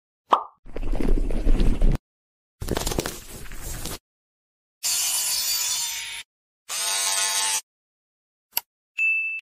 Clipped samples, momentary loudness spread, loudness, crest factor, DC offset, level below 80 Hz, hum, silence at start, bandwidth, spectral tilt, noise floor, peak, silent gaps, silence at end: under 0.1%; 16 LU; -24 LUFS; 22 dB; under 0.1%; -28 dBFS; none; 0.3 s; 16 kHz; -2 dB/octave; under -90 dBFS; -4 dBFS; 0.59-0.63 s, 1.99-2.58 s, 4.00-4.81 s, 6.25-6.66 s, 7.63-8.50 s, 8.66-8.95 s; 0 s